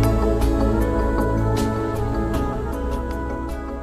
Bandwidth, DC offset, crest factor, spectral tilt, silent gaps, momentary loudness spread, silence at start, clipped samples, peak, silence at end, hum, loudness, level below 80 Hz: 14.5 kHz; under 0.1%; 14 dB; -7.5 dB/octave; none; 7 LU; 0 s; under 0.1%; -6 dBFS; 0 s; none; -23 LUFS; -24 dBFS